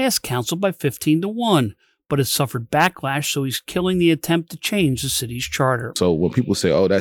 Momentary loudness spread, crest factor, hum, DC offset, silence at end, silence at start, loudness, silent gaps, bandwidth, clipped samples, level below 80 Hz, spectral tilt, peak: 5 LU; 16 dB; none; under 0.1%; 0 s; 0 s; -20 LUFS; none; over 20 kHz; under 0.1%; -48 dBFS; -4.5 dB/octave; -4 dBFS